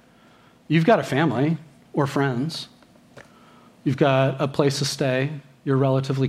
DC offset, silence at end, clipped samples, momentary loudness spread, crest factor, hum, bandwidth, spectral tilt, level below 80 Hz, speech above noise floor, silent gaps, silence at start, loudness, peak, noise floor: under 0.1%; 0 s; under 0.1%; 11 LU; 20 dB; none; 14 kHz; -6 dB/octave; -64 dBFS; 32 dB; none; 0.7 s; -22 LUFS; -4 dBFS; -53 dBFS